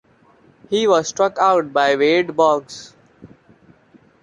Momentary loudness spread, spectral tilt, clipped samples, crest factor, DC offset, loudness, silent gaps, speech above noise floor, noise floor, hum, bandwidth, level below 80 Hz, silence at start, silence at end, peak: 8 LU; -3.5 dB/octave; under 0.1%; 16 dB; under 0.1%; -17 LUFS; none; 36 dB; -53 dBFS; none; 10.5 kHz; -64 dBFS; 0.7 s; 0.95 s; -2 dBFS